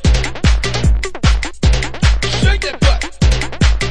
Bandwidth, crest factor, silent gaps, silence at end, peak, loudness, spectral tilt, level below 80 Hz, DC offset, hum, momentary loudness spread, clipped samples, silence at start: 10.5 kHz; 14 dB; none; 0 s; 0 dBFS; -16 LUFS; -5 dB/octave; -16 dBFS; under 0.1%; none; 1 LU; under 0.1%; 0 s